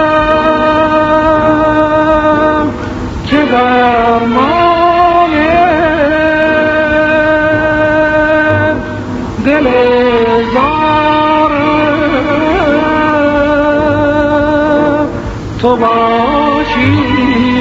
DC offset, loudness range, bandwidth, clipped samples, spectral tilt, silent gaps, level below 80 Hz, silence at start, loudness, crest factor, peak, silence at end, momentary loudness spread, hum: 0.2%; 2 LU; 7.8 kHz; under 0.1%; -7 dB/octave; none; -30 dBFS; 0 s; -10 LUFS; 10 dB; 0 dBFS; 0 s; 4 LU; none